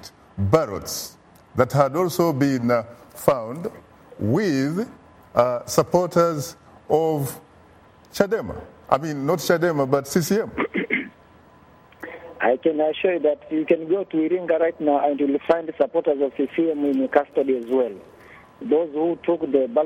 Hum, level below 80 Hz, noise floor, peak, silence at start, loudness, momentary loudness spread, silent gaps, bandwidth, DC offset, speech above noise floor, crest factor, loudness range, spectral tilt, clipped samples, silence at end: none; -56 dBFS; -51 dBFS; 0 dBFS; 0 s; -22 LUFS; 12 LU; none; 16.5 kHz; under 0.1%; 30 dB; 22 dB; 3 LU; -6 dB/octave; under 0.1%; 0 s